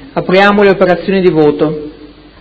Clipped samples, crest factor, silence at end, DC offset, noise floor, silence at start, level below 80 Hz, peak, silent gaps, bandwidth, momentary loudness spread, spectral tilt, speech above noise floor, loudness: 0.7%; 10 dB; 0.35 s; under 0.1%; -35 dBFS; 0 s; -40 dBFS; 0 dBFS; none; 8 kHz; 10 LU; -7.5 dB/octave; 26 dB; -9 LUFS